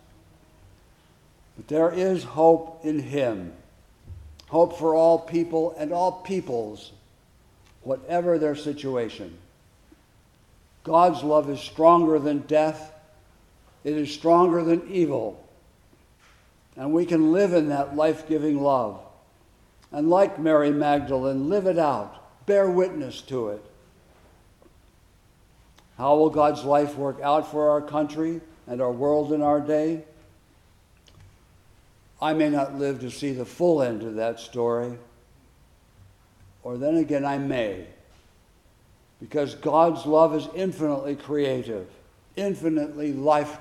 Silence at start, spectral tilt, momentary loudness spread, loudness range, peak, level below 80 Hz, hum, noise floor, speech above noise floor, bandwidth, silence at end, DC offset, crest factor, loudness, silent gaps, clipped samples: 1.6 s; -7 dB/octave; 15 LU; 7 LU; -4 dBFS; -60 dBFS; none; -58 dBFS; 35 dB; 12.5 kHz; 0 s; under 0.1%; 20 dB; -23 LUFS; none; under 0.1%